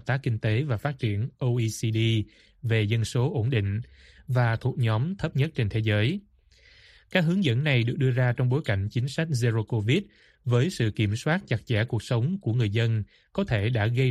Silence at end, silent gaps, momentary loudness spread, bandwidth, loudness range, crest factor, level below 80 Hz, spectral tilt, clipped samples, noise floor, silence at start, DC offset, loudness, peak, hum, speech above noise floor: 0 s; none; 5 LU; 12 kHz; 2 LU; 18 dB; -54 dBFS; -6.5 dB/octave; under 0.1%; -57 dBFS; 0.05 s; under 0.1%; -26 LUFS; -6 dBFS; none; 32 dB